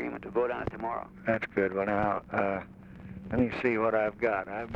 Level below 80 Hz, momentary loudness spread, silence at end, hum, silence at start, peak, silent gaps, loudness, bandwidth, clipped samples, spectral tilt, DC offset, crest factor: -54 dBFS; 9 LU; 0 s; none; 0 s; -12 dBFS; none; -30 LUFS; 7.6 kHz; under 0.1%; -8.5 dB/octave; under 0.1%; 18 dB